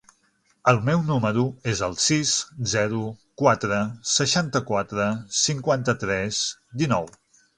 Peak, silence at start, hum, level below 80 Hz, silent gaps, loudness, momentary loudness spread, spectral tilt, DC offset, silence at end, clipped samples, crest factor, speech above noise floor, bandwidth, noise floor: -2 dBFS; 0.65 s; none; -54 dBFS; none; -23 LUFS; 6 LU; -4 dB/octave; under 0.1%; 0.5 s; under 0.1%; 22 dB; 42 dB; 11 kHz; -66 dBFS